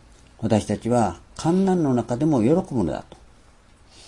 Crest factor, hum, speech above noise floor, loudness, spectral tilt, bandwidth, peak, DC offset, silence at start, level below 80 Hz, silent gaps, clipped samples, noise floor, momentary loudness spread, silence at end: 18 dB; none; 31 dB; -22 LUFS; -7.5 dB/octave; 11.5 kHz; -6 dBFS; under 0.1%; 0.4 s; -50 dBFS; none; under 0.1%; -52 dBFS; 8 LU; 1.05 s